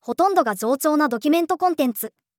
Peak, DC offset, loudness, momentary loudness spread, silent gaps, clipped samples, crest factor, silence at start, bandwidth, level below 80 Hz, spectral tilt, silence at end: -4 dBFS; under 0.1%; -20 LUFS; 4 LU; none; under 0.1%; 16 dB; 0.05 s; 19.5 kHz; -74 dBFS; -4 dB/octave; 0.3 s